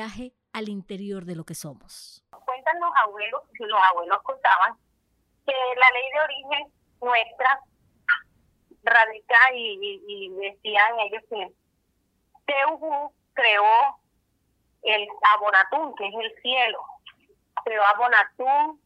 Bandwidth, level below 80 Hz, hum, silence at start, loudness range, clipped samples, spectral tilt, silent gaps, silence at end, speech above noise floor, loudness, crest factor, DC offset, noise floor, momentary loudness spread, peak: 13.5 kHz; -68 dBFS; none; 0 s; 5 LU; under 0.1%; -3 dB/octave; none; 0.15 s; 48 dB; -22 LUFS; 20 dB; under 0.1%; -71 dBFS; 17 LU; -4 dBFS